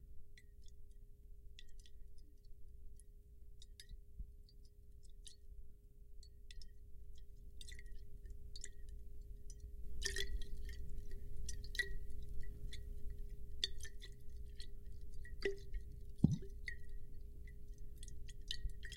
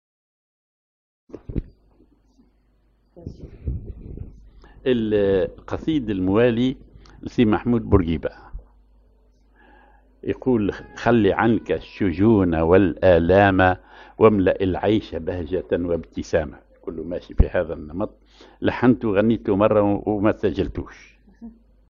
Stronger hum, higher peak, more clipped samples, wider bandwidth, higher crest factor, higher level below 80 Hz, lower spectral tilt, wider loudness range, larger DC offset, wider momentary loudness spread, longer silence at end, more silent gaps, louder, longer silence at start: neither; second, -16 dBFS vs 0 dBFS; neither; first, 13.5 kHz vs 7.2 kHz; first, 28 dB vs 22 dB; second, -50 dBFS vs -36 dBFS; second, -4.5 dB/octave vs -8.5 dB/octave; about the same, 16 LU vs 17 LU; neither; first, 21 LU vs 18 LU; second, 0 s vs 0.45 s; neither; second, -49 LUFS vs -21 LUFS; second, 0 s vs 1.35 s